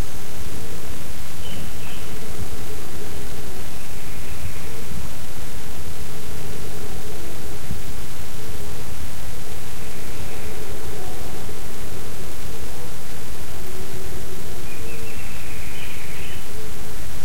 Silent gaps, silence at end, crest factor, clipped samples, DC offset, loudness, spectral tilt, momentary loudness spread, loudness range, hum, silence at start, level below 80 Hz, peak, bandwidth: none; 0 s; 16 dB; under 0.1%; 30%; -34 LUFS; -4 dB/octave; 2 LU; 0 LU; none; 0 s; -40 dBFS; -8 dBFS; 16.5 kHz